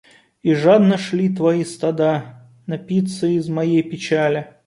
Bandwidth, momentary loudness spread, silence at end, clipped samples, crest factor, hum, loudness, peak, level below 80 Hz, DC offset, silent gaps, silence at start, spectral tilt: 11.5 kHz; 10 LU; 0.2 s; under 0.1%; 16 dB; none; -18 LUFS; -2 dBFS; -62 dBFS; under 0.1%; none; 0.45 s; -7 dB/octave